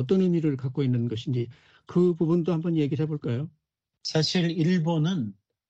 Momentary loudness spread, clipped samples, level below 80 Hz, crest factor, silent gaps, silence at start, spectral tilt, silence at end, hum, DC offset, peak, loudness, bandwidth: 8 LU; under 0.1%; -66 dBFS; 14 dB; none; 0 s; -7 dB/octave; 0.4 s; none; under 0.1%; -12 dBFS; -26 LUFS; 8.2 kHz